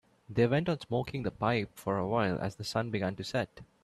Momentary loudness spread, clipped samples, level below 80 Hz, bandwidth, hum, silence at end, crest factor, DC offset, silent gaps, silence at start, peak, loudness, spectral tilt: 7 LU; under 0.1%; -60 dBFS; 13.5 kHz; none; 0.2 s; 18 dB; under 0.1%; none; 0.3 s; -14 dBFS; -32 LUFS; -6.5 dB/octave